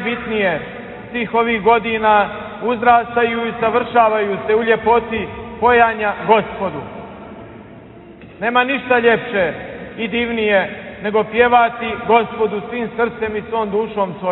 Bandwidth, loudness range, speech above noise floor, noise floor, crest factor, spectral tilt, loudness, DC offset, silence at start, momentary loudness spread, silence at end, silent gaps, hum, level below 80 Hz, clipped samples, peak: 4.1 kHz; 4 LU; 22 dB; -38 dBFS; 16 dB; -9.5 dB/octave; -17 LUFS; under 0.1%; 0 s; 13 LU; 0 s; none; none; -48 dBFS; under 0.1%; 0 dBFS